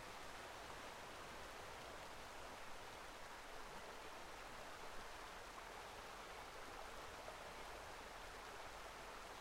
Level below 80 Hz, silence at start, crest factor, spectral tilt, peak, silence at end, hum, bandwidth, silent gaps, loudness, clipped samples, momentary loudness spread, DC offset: -66 dBFS; 0 s; 14 dB; -2.5 dB/octave; -40 dBFS; 0 s; none; 16 kHz; none; -54 LUFS; under 0.1%; 1 LU; under 0.1%